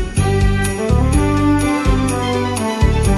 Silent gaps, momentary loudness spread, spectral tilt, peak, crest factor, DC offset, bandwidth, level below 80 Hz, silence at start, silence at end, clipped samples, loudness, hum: none; 3 LU; -6 dB/octave; -2 dBFS; 12 dB; under 0.1%; 13 kHz; -20 dBFS; 0 s; 0 s; under 0.1%; -16 LUFS; 50 Hz at -30 dBFS